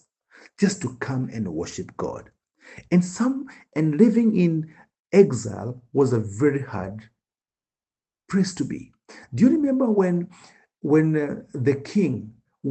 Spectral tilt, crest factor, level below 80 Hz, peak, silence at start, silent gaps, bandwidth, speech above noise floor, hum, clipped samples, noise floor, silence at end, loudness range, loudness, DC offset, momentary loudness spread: -7 dB/octave; 20 dB; -62 dBFS; -2 dBFS; 0.6 s; 4.99-5.05 s; 9 kHz; over 68 dB; none; under 0.1%; under -90 dBFS; 0 s; 6 LU; -23 LUFS; under 0.1%; 15 LU